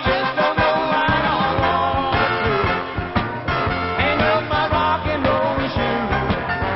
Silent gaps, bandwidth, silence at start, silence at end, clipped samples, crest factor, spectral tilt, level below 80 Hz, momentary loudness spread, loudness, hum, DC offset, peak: none; 6 kHz; 0 s; 0 s; under 0.1%; 14 dB; -3.5 dB/octave; -34 dBFS; 4 LU; -19 LUFS; none; under 0.1%; -4 dBFS